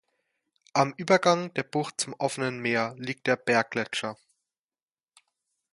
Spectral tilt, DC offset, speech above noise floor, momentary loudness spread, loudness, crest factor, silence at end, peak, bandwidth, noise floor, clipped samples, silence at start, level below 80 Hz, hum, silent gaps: -4 dB/octave; under 0.1%; over 63 dB; 9 LU; -27 LUFS; 22 dB; 1.6 s; -6 dBFS; 11.5 kHz; under -90 dBFS; under 0.1%; 0.75 s; -74 dBFS; none; none